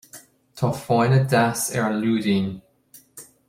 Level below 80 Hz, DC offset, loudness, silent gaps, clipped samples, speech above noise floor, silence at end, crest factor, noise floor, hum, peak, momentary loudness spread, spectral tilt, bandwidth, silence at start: -58 dBFS; under 0.1%; -21 LUFS; none; under 0.1%; 32 dB; 0.25 s; 18 dB; -53 dBFS; none; -4 dBFS; 11 LU; -5.5 dB/octave; 16 kHz; 0.15 s